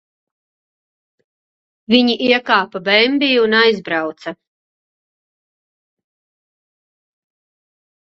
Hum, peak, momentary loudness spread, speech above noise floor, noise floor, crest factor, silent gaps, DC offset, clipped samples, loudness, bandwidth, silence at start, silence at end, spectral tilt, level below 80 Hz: none; 0 dBFS; 10 LU; over 75 dB; under -90 dBFS; 20 dB; none; under 0.1%; under 0.1%; -14 LUFS; 7 kHz; 1.9 s; 3.75 s; -5 dB/octave; -66 dBFS